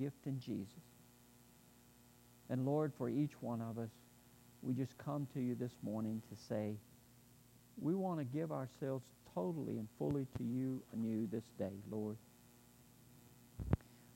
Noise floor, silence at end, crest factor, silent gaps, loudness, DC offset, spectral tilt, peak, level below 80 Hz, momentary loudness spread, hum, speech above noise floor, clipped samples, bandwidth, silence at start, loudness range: -66 dBFS; 0 s; 24 dB; none; -43 LUFS; under 0.1%; -8 dB/octave; -20 dBFS; -64 dBFS; 19 LU; 60 Hz at -70 dBFS; 24 dB; under 0.1%; 16 kHz; 0 s; 2 LU